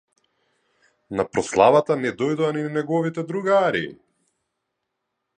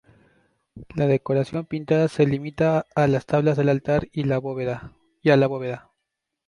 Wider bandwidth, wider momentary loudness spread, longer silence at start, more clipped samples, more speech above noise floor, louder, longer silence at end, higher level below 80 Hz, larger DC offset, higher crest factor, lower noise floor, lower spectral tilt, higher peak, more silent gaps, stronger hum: about the same, 9.8 kHz vs 10.5 kHz; about the same, 11 LU vs 10 LU; first, 1.1 s vs 0.75 s; neither; about the same, 58 dB vs 59 dB; about the same, -21 LUFS vs -22 LUFS; first, 1.45 s vs 0.7 s; second, -60 dBFS vs -52 dBFS; neither; about the same, 22 dB vs 18 dB; about the same, -79 dBFS vs -81 dBFS; second, -5.5 dB/octave vs -8 dB/octave; about the same, -2 dBFS vs -4 dBFS; neither; neither